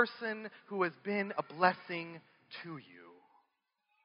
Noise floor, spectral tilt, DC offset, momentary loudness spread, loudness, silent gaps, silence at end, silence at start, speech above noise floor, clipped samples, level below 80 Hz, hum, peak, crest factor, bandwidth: -82 dBFS; -3 dB/octave; under 0.1%; 19 LU; -36 LUFS; none; 0.9 s; 0 s; 45 dB; under 0.1%; under -90 dBFS; none; -12 dBFS; 26 dB; 5.4 kHz